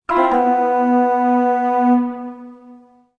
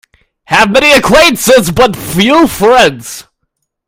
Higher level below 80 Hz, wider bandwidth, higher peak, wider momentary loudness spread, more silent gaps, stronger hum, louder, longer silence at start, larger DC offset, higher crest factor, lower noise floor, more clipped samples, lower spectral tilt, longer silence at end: second, -56 dBFS vs -34 dBFS; second, 6.4 kHz vs 20 kHz; about the same, -2 dBFS vs 0 dBFS; first, 14 LU vs 8 LU; neither; neither; second, -16 LUFS vs -7 LUFS; second, 0.1 s vs 0.5 s; neither; first, 14 dB vs 8 dB; second, -45 dBFS vs -67 dBFS; second, under 0.1% vs 2%; first, -6.5 dB/octave vs -3.5 dB/octave; second, 0.45 s vs 0.65 s